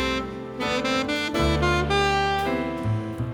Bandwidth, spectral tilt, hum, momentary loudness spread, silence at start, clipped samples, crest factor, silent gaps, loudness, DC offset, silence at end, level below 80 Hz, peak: 19 kHz; -5 dB/octave; none; 7 LU; 0 s; under 0.1%; 16 dB; none; -24 LUFS; under 0.1%; 0 s; -36 dBFS; -8 dBFS